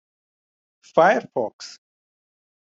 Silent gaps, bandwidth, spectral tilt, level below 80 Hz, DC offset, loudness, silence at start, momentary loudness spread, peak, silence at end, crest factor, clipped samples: 1.53-1.59 s; 7.8 kHz; -5 dB/octave; -74 dBFS; under 0.1%; -21 LUFS; 0.95 s; 22 LU; -2 dBFS; 1 s; 22 dB; under 0.1%